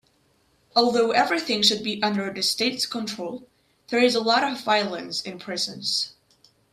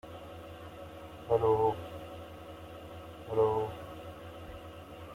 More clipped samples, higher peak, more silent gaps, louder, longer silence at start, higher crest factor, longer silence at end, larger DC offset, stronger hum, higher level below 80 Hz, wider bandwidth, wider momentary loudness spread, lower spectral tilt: neither; first, -6 dBFS vs -16 dBFS; neither; first, -23 LUFS vs -32 LUFS; first, 0.75 s vs 0.05 s; about the same, 20 dB vs 20 dB; first, 0.65 s vs 0 s; neither; neither; second, -70 dBFS vs -58 dBFS; about the same, 15 kHz vs 16 kHz; second, 11 LU vs 19 LU; second, -2.5 dB/octave vs -7 dB/octave